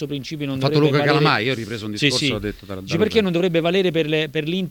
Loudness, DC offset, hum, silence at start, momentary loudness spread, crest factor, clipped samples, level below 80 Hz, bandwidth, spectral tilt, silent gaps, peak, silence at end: -20 LUFS; under 0.1%; none; 0 s; 10 LU; 18 dB; under 0.1%; -48 dBFS; 18.5 kHz; -5.5 dB/octave; none; -2 dBFS; 0 s